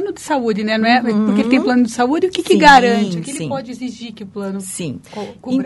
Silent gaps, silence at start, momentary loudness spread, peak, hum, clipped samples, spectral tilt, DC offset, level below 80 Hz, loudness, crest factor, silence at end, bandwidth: none; 0 s; 18 LU; 0 dBFS; none; 0.1%; -4.5 dB/octave; under 0.1%; -46 dBFS; -15 LUFS; 16 dB; 0 s; 12 kHz